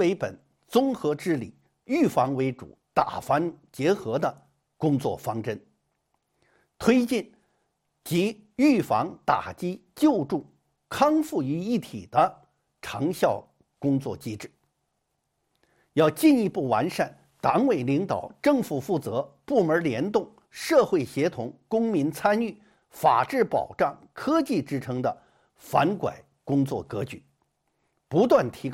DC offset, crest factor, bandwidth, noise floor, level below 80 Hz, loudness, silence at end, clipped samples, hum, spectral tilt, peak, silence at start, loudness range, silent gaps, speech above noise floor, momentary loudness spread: under 0.1%; 20 dB; 16.5 kHz; -77 dBFS; -64 dBFS; -26 LUFS; 0 s; under 0.1%; none; -6.5 dB/octave; -6 dBFS; 0 s; 4 LU; none; 52 dB; 12 LU